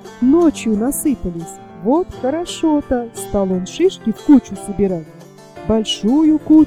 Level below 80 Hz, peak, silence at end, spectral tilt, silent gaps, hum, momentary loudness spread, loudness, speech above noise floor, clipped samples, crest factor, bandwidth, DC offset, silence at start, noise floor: -40 dBFS; 0 dBFS; 0 s; -5.5 dB/octave; none; none; 11 LU; -17 LUFS; 21 dB; under 0.1%; 16 dB; 15.5 kHz; under 0.1%; 0.05 s; -37 dBFS